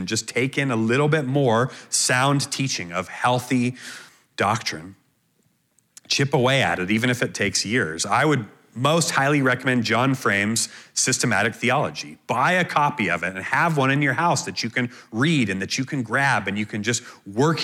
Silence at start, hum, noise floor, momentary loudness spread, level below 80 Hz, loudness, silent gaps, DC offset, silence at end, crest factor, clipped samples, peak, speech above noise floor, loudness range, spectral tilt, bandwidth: 0 s; none; -66 dBFS; 7 LU; -64 dBFS; -21 LUFS; none; under 0.1%; 0 s; 18 dB; under 0.1%; -4 dBFS; 44 dB; 4 LU; -4 dB/octave; 16 kHz